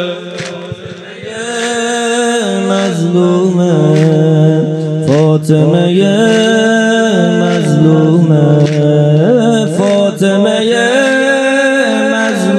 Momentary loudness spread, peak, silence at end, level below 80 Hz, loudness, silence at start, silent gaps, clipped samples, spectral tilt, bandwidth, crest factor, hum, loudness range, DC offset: 10 LU; 0 dBFS; 0 s; -58 dBFS; -10 LUFS; 0 s; none; 0.3%; -6 dB/octave; 12 kHz; 10 dB; none; 3 LU; under 0.1%